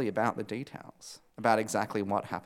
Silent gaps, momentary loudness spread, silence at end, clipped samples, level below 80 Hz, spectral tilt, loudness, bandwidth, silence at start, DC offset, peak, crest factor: none; 19 LU; 0 s; under 0.1%; -74 dBFS; -5 dB/octave; -31 LUFS; 16.5 kHz; 0 s; under 0.1%; -10 dBFS; 22 dB